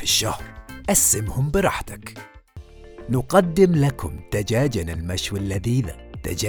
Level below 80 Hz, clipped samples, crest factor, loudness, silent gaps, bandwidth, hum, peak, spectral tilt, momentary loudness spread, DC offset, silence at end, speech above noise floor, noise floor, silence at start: -38 dBFS; under 0.1%; 20 dB; -21 LUFS; none; over 20 kHz; none; -2 dBFS; -4 dB/octave; 18 LU; under 0.1%; 0 s; 21 dB; -42 dBFS; 0 s